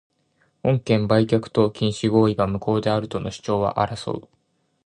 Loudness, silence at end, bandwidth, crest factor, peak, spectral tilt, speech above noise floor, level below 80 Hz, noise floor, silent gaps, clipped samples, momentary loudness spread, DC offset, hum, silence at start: -22 LUFS; 0.65 s; 10.5 kHz; 18 dB; -4 dBFS; -7 dB/octave; 45 dB; -50 dBFS; -66 dBFS; none; under 0.1%; 10 LU; under 0.1%; none; 0.65 s